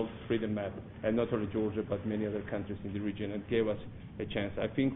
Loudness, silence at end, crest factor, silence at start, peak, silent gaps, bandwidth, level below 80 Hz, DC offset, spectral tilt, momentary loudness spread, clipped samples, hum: -35 LUFS; 0 s; 18 dB; 0 s; -16 dBFS; none; 4 kHz; -56 dBFS; under 0.1%; -6 dB/octave; 7 LU; under 0.1%; none